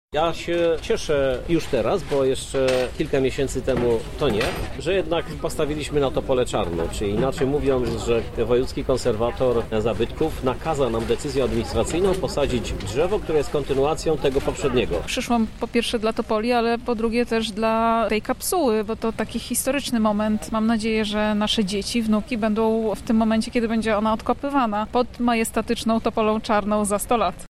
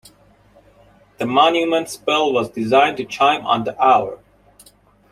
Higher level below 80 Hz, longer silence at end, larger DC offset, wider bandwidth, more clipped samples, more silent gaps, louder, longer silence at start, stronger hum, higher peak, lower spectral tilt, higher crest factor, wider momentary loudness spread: first, -38 dBFS vs -60 dBFS; second, 0 s vs 0.95 s; neither; about the same, 15.5 kHz vs 15.5 kHz; neither; neither; second, -23 LUFS vs -17 LUFS; second, 0.1 s vs 1.2 s; second, none vs 50 Hz at -50 dBFS; second, -8 dBFS vs -2 dBFS; about the same, -5 dB/octave vs -4 dB/octave; about the same, 14 dB vs 18 dB; second, 3 LU vs 6 LU